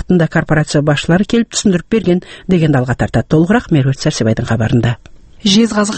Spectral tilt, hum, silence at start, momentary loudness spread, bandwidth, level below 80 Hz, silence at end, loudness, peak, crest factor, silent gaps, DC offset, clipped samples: -5.5 dB/octave; none; 0 s; 4 LU; 8.8 kHz; -34 dBFS; 0 s; -13 LUFS; 0 dBFS; 12 dB; none; under 0.1%; under 0.1%